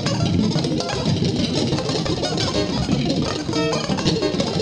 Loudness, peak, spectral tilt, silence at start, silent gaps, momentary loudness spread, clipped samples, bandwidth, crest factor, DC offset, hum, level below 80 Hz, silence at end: -21 LUFS; -6 dBFS; -5.5 dB/octave; 0 s; none; 2 LU; under 0.1%; 11 kHz; 14 dB; under 0.1%; none; -40 dBFS; 0 s